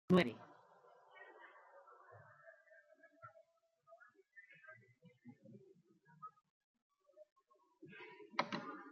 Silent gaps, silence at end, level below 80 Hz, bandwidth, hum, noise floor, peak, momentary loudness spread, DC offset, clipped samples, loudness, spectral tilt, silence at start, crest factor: 6.50-6.74 s, 6.82-6.90 s, 7.32-7.36 s; 0 s; -82 dBFS; 7.4 kHz; none; -75 dBFS; -20 dBFS; 24 LU; under 0.1%; under 0.1%; -42 LUFS; -5 dB/octave; 0.1 s; 26 dB